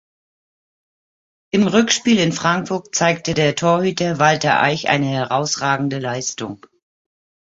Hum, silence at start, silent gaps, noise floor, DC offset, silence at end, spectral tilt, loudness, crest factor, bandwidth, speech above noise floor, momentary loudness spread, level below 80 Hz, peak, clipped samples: none; 1.55 s; none; under -90 dBFS; under 0.1%; 1 s; -4 dB/octave; -17 LUFS; 18 dB; 8 kHz; over 72 dB; 7 LU; -56 dBFS; -2 dBFS; under 0.1%